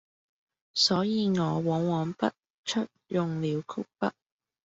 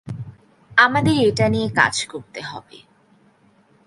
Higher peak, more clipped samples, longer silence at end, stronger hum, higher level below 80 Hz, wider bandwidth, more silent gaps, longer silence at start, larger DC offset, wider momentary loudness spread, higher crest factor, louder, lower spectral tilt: second, -12 dBFS vs 0 dBFS; neither; second, 0.55 s vs 1.25 s; neither; second, -68 dBFS vs -50 dBFS; second, 8 kHz vs 11.5 kHz; first, 2.50-2.64 s vs none; first, 0.75 s vs 0.05 s; neither; second, 10 LU vs 19 LU; about the same, 18 dB vs 20 dB; second, -29 LUFS vs -17 LUFS; about the same, -5.5 dB/octave vs -4.5 dB/octave